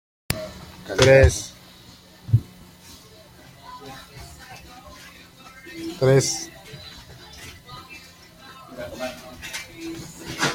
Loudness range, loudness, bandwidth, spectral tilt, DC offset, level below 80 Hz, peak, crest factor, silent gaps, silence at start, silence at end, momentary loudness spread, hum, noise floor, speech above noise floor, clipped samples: 16 LU; -22 LUFS; 16.5 kHz; -4.5 dB/octave; under 0.1%; -40 dBFS; -2 dBFS; 24 dB; none; 0.3 s; 0 s; 26 LU; none; -48 dBFS; 31 dB; under 0.1%